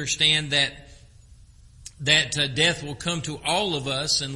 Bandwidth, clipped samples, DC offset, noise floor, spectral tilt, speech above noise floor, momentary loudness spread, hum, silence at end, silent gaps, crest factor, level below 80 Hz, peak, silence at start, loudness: 11.5 kHz; under 0.1%; under 0.1%; -50 dBFS; -2.5 dB/octave; 26 dB; 9 LU; none; 0 s; none; 22 dB; -50 dBFS; -2 dBFS; 0 s; -22 LUFS